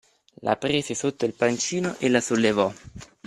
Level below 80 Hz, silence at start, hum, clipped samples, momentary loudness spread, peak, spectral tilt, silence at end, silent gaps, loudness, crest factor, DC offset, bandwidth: -58 dBFS; 0.4 s; none; under 0.1%; 8 LU; -4 dBFS; -4 dB/octave; 0.2 s; none; -24 LUFS; 20 dB; under 0.1%; 13 kHz